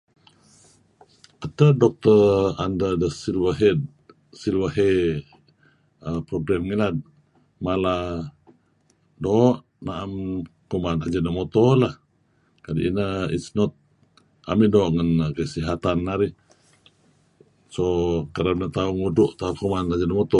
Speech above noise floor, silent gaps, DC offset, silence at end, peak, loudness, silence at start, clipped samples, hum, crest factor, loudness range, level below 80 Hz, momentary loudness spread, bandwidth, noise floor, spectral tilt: 43 dB; none; under 0.1%; 0 s; -2 dBFS; -22 LUFS; 1.4 s; under 0.1%; none; 20 dB; 6 LU; -44 dBFS; 13 LU; 11 kHz; -64 dBFS; -7.5 dB/octave